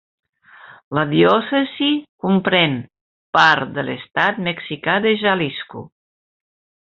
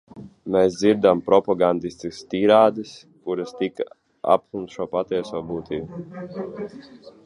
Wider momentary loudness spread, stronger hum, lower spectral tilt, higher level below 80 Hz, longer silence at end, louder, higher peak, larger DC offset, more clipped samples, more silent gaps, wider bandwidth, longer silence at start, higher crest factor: second, 11 LU vs 18 LU; neither; second, -3 dB/octave vs -6 dB/octave; about the same, -60 dBFS vs -58 dBFS; first, 1.1 s vs 0.15 s; first, -18 LUFS vs -22 LUFS; about the same, -2 dBFS vs -2 dBFS; neither; neither; first, 0.84-0.91 s, 2.09-2.18 s, 3.01-3.33 s vs none; second, 7.4 kHz vs 11 kHz; first, 0.65 s vs 0.15 s; about the same, 18 dB vs 20 dB